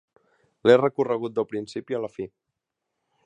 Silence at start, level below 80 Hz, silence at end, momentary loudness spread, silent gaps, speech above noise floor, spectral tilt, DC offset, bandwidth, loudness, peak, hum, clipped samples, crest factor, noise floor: 0.65 s; -68 dBFS; 1 s; 16 LU; none; 59 dB; -6.5 dB/octave; under 0.1%; 9.2 kHz; -24 LUFS; -4 dBFS; none; under 0.1%; 22 dB; -83 dBFS